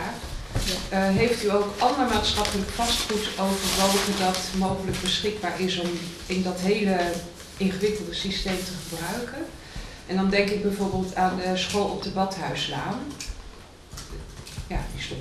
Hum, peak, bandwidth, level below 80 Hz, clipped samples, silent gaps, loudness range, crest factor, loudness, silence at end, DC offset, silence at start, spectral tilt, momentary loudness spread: none; -6 dBFS; 14 kHz; -40 dBFS; under 0.1%; none; 6 LU; 20 dB; -25 LUFS; 0 s; under 0.1%; 0 s; -4 dB/octave; 15 LU